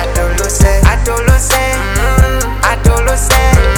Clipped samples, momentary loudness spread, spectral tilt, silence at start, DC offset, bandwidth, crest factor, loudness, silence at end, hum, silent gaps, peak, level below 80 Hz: 0.6%; 5 LU; -4.5 dB/octave; 0 s; under 0.1%; 19 kHz; 10 dB; -11 LUFS; 0 s; none; none; 0 dBFS; -12 dBFS